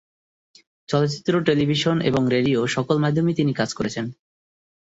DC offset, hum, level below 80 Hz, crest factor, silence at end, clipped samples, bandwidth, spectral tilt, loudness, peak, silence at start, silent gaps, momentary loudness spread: under 0.1%; none; -56 dBFS; 16 dB; 0.75 s; under 0.1%; 8 kHz; -6 dB/octave; -21 LUFS; -6 dBFS; 0.9 s; none; 6 LU